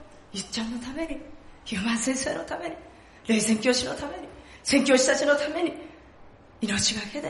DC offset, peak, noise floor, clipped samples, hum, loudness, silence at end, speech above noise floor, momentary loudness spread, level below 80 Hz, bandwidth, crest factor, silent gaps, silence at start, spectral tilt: under 0.1%; -6 dBFS; -50 dBFS; under 0.1%; none; -26 LUFS; 0 s; 24 dB; 20 LU; -54 dBFS; 11.5 kHz; 20 dB; none; 0 s; -3 dB/octave